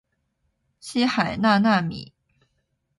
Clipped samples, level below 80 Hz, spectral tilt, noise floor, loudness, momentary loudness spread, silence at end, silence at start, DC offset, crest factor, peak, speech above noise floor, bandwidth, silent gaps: under 0.1%; -58 dBFS; -5.5 dB/octave; -73 dBFS; -22 LUFS; 17 LU; 0.95 s; 0.85 s; under 0.1%; 18 dB; -6 dBFS; 52 dB; 11.5 kHz; none